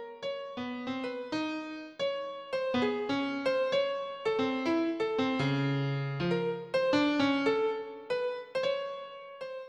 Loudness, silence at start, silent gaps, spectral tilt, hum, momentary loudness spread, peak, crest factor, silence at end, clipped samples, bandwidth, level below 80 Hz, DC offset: -32 LUFS; 0 s; none; -6.5 dB/octave; none; 11 LU; -16 dBFS; 16 dB; 0 s; under 0.1%; 9.6 kHz; -70 dBFS; under 0.1%